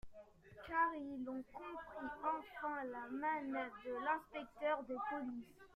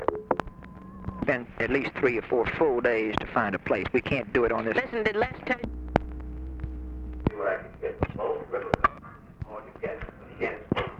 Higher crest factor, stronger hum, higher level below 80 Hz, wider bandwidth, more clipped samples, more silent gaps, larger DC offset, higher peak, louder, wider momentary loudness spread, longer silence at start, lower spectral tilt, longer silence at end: second, 18 dB vs 26 dB; neither; second, -72 dBFS vs -42 dBFS; first, 14.5 kHz vs 8.2 kHz; neither; neither; neither; second, -26 dBFS vs -4 dBFS; second, -43 LUFS vs -28 LUFS; second, 12 LU vs 15 LU; about the same, 0.05 s vs 0 s; second, -6 dB/octave vs -7.5 dB/octave; about the same, 0.05 s vs 0 s